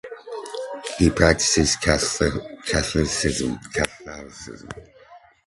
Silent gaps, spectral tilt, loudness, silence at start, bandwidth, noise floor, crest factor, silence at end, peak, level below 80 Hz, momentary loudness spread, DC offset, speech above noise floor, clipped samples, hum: none; -3.5 dB/octave; -21 LUFS; 0.05 s; 11.5 kHz; -49 dBFS; 22 dB; 0.3 s; 0 dBFS; -36 dBFS; 20 LU; under 0.1%; 27 dB; under 0.1%; none